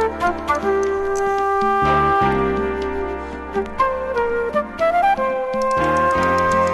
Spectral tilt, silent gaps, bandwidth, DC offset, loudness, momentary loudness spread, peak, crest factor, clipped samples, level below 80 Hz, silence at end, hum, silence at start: -5.5 dB/octave; none; 12 kHz; under 0.1%; -19 LUFS; 8 LU; -6 dBFS; 12 dB; under 0.1%; -38 dBFS; 0 s; none; 0 s